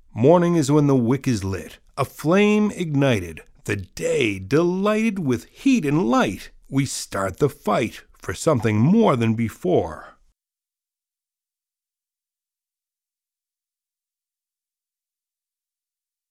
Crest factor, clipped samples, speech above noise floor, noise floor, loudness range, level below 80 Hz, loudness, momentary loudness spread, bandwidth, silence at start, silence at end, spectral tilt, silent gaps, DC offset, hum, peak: 20 dB; under 0.1%; over 70 dB; under -90 dBFS; 3 LU; -52 dBFS; -21 LUFS; 12 LU; 16 kHz; 0.15 s; 6.2 s; -6.5 dB/octave; none; under 0.1%; none; -2 dBFS